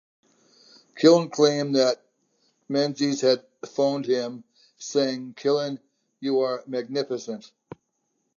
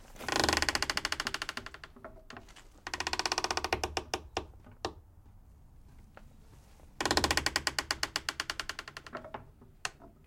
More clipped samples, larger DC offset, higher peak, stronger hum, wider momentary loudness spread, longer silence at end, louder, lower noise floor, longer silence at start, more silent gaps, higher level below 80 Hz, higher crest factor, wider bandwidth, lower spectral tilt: neither; neither; first, -4 dBFS vs -8 dBFS; neither; second, 15 LU vs 20 LU; first, 0.95 s vs 0.15 s; first, -24 LUFS vs -33 LUFS; first, -75 dBFS vs -56 dBFS; first, 0.95 s vs 0 s; neither; second, -80 dBFS vs -52 dBFS; second, 22 dB vs 28 dB; second, 7.4 kHz vs 17 kHz; first, -5 dB/octave vs -2 dB/octave